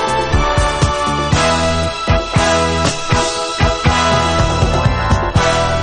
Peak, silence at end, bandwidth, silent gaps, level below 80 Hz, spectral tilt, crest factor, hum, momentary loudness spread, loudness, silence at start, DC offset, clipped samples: 0 dBFS; 0 s; 10.5 kHz; none; -22 dBFS; -4.5 dB/octave; 14 dB; none; 3 LU; -14 LUFS; 0 s; under 0.1%; under 0.1%